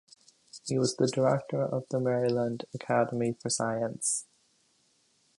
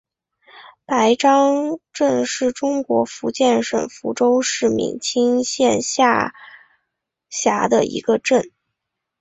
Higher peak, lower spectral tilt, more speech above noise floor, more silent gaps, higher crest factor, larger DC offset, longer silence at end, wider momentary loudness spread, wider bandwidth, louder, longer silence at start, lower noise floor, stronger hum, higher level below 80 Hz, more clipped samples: second, -12 dBFS vs -2 dBFS; about the same, -4.5 dB/octave vs -3.5 dB/octave; second, 40 dB vs 62 dB; neither; about the same, 18 dB vs 16 dB; neither; first, 1.15 s vs 0.7 s; about the same, 6 LU vs 8 LU; first, 11.5 kHz vs 8.4 kHz; second, -30 LUFS vs -18 LUFS; about the same, 0.55 s vs 0.55 s; second, -69 dBFS vs -80 dBFS; neither; second, -72 dBFS vs -60 dBFS; neither